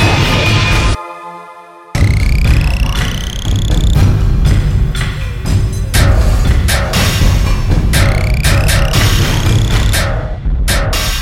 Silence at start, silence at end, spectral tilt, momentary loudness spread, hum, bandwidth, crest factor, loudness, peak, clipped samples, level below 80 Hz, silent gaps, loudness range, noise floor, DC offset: 0 s; 0 s; -4.5 dB/octave; 7 LU; none; 16.5 kHz; 10 dB; -13 LUFS; 0 dBFS; under 0.1%; -14 dBFS; none; 2 LU; -34 dBFS; under 0.1%